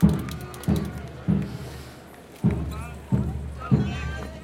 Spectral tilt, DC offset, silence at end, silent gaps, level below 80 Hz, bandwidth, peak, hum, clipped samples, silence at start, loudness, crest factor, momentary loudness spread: -7.5 dB/octave; under 0.1%; 0 s; none; -36 dBFS; 17 kHz; -4 dBFS; none; under 0.1%; 0 s; -28 LUFS; 22 dB; 15 LU